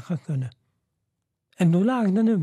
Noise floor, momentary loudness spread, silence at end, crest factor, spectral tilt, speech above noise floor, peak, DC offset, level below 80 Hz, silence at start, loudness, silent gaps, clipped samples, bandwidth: -79 dBFS; 10 LU; 0 s; 14 dB; -8.5 dB/octave; 58 dB; -10 dBFS; under 0.1%; -74 dBFS; 0.1 s; -23 LUFS; none; under 0.1%; 11 kHz